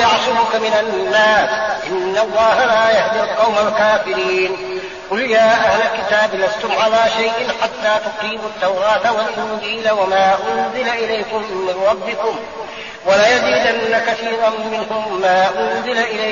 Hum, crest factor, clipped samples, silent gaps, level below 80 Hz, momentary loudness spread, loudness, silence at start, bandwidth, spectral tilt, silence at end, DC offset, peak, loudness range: none; 14 dB; under 0.1%; none; -52 dBFS; 9 LU; -16 LUFS; 0 s; 7.2 kHz; -0.5 dB/octave; 0 s; 0.2%; -2 dBFS; 3 LU